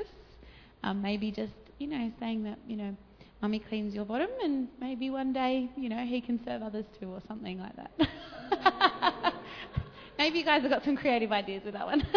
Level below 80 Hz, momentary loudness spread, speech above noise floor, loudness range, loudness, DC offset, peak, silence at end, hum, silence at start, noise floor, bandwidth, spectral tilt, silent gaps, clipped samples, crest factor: -54 dBFS; 15 LU; 22 dB; 7 LU; -32 LUFS; under 0.1%; -8 dBFS; 0 s; none; 0 s; -54 dBFS; 5.4 kHz; -6.5 dB/octave; none; under 0.1%; 24 dB